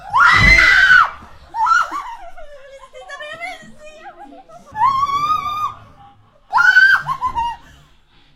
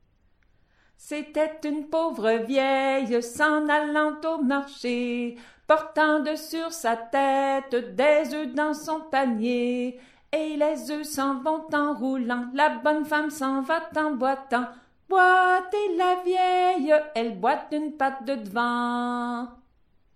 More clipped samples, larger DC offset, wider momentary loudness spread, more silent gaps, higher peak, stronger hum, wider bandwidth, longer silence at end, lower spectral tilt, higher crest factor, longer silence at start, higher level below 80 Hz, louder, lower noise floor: neither; neither; first, 23 LU vs 9 LU; neither; first, 0 dBFS vs -6 dBFS; neither; about the same, 16.5 kHz vs 15.5 kHz; first, 0.8 s vs 0.6 s; about the same, -2.5 dB/octave vs -3.5 dB/octave; about the same, 16 dB vs 20 dB; second, 0 s vs 1.05 s; first, -34 dBFS vs -66 dBFS; first, -13 LUFS vs -25 LUFS; second, -50 dBFS vs -64 dBFS